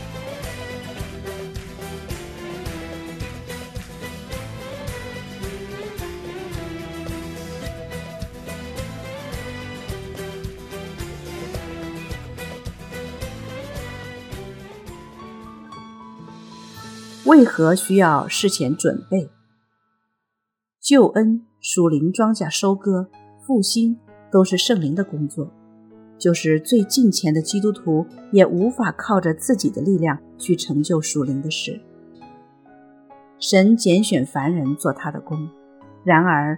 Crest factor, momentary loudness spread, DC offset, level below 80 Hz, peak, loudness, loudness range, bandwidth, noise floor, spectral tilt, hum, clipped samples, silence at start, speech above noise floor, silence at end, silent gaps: 22 dB; 19 LU; under 0.1%; -44 dBFS; 0 dBFS; -20 LUFS; 15 LU; 18 kHz; -82 dBFS; -5 dB/octave; none; under 0.1%; 0 s; 64 dB; 0 s; none